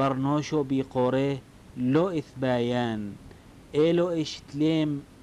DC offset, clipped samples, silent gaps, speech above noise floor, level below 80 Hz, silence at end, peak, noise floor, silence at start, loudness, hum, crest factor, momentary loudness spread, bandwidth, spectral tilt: under 0.1%; under 0.1%; none; 22 dB; -56 dBFS; 0.15 s; -14 dBFS; -48 dBFS; 0 s; -27 LUFS; none; 14 dB; 10 LU; 11.5 kHz; -7 dB/octave